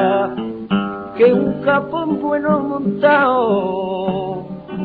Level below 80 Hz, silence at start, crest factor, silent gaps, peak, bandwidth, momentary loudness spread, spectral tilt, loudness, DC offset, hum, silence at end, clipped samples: -52 dBFS; 0 s; 14 dB; none; -2 dBFS; 4.8 kHz; 11 LU; -9.5 dB/octave; -17 LUFS; under 0.1%; none; 0 s; under 0.1%